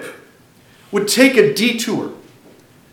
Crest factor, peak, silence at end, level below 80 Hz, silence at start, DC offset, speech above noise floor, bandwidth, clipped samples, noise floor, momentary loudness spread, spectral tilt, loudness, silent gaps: 18 dB; 0 dBFS; 0.75 s; -66 dBFS; 0 s; under 0.1%; 34 dB; 17.5 kHz; under 0.1%; -48 dBFS; 16 LU; -3.5 dB/octave; -15 LUFS; none